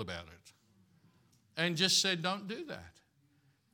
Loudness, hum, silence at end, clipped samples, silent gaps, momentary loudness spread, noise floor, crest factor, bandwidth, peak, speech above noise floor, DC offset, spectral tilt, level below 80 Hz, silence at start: -32 LUFS; none; 0.85 s; under 0.1%; none; 19 LU; -71 dBFS; 24 dB; 18 kHz; -14 dBFS; 36 dB; under 0.1%; -2.5 dB/octave; -76 dBFS; 0 s